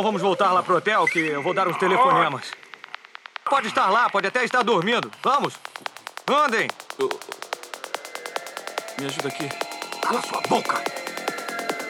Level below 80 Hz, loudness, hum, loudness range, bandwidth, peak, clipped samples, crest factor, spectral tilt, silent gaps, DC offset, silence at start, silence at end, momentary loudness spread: under -90 dBFS; -23 LUFS; none; 7 LU; 19.5 kHz; -6 dBFS; under 0.1%; 18 dB; -3.5 dB/octave; none; under 0.1%; 0 s; 0 s; 14 LU